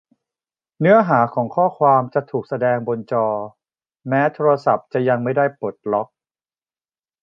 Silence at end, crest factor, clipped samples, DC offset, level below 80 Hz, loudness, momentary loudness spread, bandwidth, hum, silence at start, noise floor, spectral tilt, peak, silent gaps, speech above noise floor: 1.2 s; 18 dB; under 0.1%; under 0.1%; -68 dBFS; -19 LUFS; 10 LU; 6.2 kHz; none; 0.8 s; under -90 dBFS; -9.5 dB/octave; -2 dBFS; none; over 72 dB